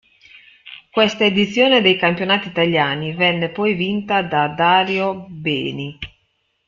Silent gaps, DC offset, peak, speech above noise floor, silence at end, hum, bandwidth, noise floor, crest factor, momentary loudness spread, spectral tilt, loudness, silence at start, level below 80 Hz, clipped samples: none; under 0.1%; -2 dBFS; 49 dB; 0.6 s; none; 7.4 kHz; -67 dBFS; 18 dB; 12 LU; -5.5 dB/octave; -17 LUFS; 0.65 s; -56 dBFS; under 0.1%